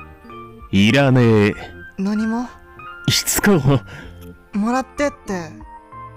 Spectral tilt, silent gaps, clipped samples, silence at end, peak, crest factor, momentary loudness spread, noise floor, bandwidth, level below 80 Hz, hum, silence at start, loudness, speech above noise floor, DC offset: -5 dB/octave; none; under 0.1%; 0.05 s; -6 dBFS; 12 dB; 24 LU; -38 dBFS; 16.5 kHz; -42 dBFS; none; 0 s; -18 LUFS; 21 dB; under 0.1%